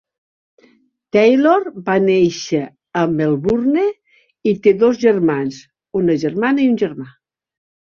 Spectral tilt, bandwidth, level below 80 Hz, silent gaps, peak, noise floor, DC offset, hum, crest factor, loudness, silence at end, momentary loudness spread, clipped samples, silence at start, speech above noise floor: -6.5 dB/octave; 7.2 kHz; -54 dBFS; none; -2 dBFS; -55 dBFS; under 0.1%; none; 16 dB; -16 LUFS; 0.75 s; 9 LU; under 0.1%; 1.15 s; 40 dB